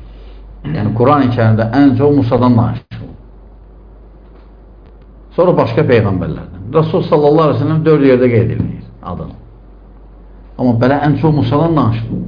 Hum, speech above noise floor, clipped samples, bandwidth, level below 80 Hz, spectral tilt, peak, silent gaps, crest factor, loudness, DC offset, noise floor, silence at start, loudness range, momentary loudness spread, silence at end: none; 26 dB; under 0.1%; 5.2 kHz; -36 dBFS; -10.5 dB/octave; 0 dBFS; none; 12 dB; -12 LUFS; under 0.1%; -38 dBFS; 0 s; 5 LU; 16 LU; 0 s